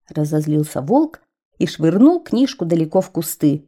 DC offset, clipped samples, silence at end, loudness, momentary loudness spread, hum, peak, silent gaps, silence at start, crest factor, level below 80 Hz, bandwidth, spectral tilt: under 0.1%; under 0.1%; 0.05 s; -18 LUFS; 10 LU; none; -2 dBFS; 1.45-1.51 s; 0.15 s; 16 dB; -60 dBFS; 17 kHz; -7 dB/octave